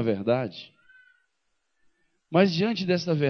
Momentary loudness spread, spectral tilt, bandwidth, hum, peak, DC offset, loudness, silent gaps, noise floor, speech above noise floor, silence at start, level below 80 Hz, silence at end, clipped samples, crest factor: 10 LU; -7 dB/octave; 6.6 kHz; none; -8 dBFS; under 0.1%; -25 LUFS; none; -75 dBFS; 51 dB; 0 s; -70 dBFS; 0 s; under 0.1%; 20 dB